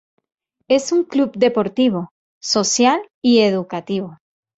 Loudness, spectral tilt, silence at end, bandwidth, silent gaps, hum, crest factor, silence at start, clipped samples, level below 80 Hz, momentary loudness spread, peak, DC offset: -18 LUFS; -4 dB/octave; 0.45 s; 8.2 kHz; 2.11-2.41 s, 3.14-3.22 s; none; 16 dB; 0.7 s; under 0.1%; -62 dBFS; 11 LU; -2 dBFS; under 0.1%